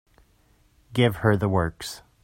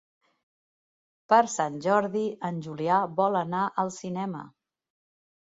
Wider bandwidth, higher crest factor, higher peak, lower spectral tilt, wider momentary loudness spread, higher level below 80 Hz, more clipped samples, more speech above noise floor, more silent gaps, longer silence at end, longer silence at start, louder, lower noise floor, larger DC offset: first, 16.5 kHz vs 8 kHz; about the same, 20 dB vs 20 dB; about the same, -6 dBFS vs -8 dBFS; about the same, -6.5 dB/octave vs -5.5 dB/octave; first, 14 LU vs 11 LU; first, -50 dBFS vs -74 dBFS; neither; second, 38 dB vs over 64 dB; neither; second, 0.25 s vs 1.1 s; second, 0.9 s vs 1.3 s; first, -24 LUFS vs -27 LUFS; second, -61 dBFS vs under -90 dBFS; neither